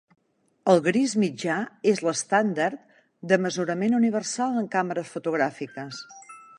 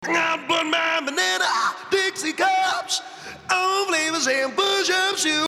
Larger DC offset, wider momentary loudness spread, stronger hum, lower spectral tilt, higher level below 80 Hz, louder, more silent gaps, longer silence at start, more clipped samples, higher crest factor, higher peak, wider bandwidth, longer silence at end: neither; first, 15 LU vs 4 LU; neither; first, -5 dB/octave vs -0.5 dB/octave; about the same, -74 dBFS vs -70 dBFS; second, -25 LUFS vs -21 LUFS; neither; first, 0.65 s vs 0 s; neither; about the same, 20 dB vs 18 dB; about the same, -6 dBFS vs -4 dBFS; second, 11 kHz vs 16.5 kHz; first, 0.15 s vs 0 s